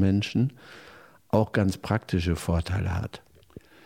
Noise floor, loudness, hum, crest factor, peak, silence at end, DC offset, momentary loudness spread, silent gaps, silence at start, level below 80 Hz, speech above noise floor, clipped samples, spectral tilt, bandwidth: -50 dBFS; -27 LUFS; none; 20 dB; -8 dBFS; 0.7 s; under 0.1%; 22 LU; none; 0 s; -44 dBFS; 24 dB; under 0.1%; -7 dB/octave; 15.5 kHz